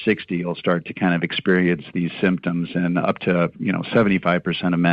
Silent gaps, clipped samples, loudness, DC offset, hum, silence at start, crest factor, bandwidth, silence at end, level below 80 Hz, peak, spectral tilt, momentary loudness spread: none; under 0.1%; -21 LUFS; under 0.1%; none; 0 s; 14 dB; 5 kHz; 0 s; -54 dBFS; -6 dBFS; -9.5 dB/octave; 5 LU